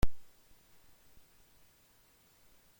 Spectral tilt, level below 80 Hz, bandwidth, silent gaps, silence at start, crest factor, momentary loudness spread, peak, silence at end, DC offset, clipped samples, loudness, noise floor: -6 dB/octave; -46 dBFS; 16.5 kHz; none; 0 s; 20 dB; 0 LU; -14 dBFS; 0 s; under 0.1%; under 0.1%; -55 LUFS; -66 dBFS